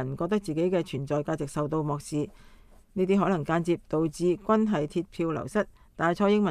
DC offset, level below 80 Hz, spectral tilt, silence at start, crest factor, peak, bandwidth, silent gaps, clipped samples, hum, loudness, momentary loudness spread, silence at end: under 0.1%; -54 dBFS; -7 dB/octave; 0 s; 16 dB; -10 dBFS; 13 kHz; none; under 0.1%; none; -28 LUFS; 7 LU; 0 s